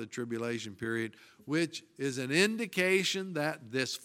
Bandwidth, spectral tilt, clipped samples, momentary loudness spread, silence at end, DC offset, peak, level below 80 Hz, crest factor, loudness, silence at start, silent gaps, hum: 17 kHz; -4 dB/octave; under 0.1%; 10 LU; 0 s; under 0.1%; -12 dBFS; -76 dBFS; 22 dB; -32 LUFS; 0 s; none; none